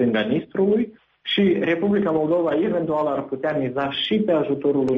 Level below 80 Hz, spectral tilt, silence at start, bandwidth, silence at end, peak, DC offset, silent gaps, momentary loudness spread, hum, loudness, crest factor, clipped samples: -58 dBFS; -8 dB/octave; 0 s; 6.4 kHz; 0 s; -8 dBFS; under 0.1%; none; 5 LU; none; -21 LUFS; 12 dB; under 0.1%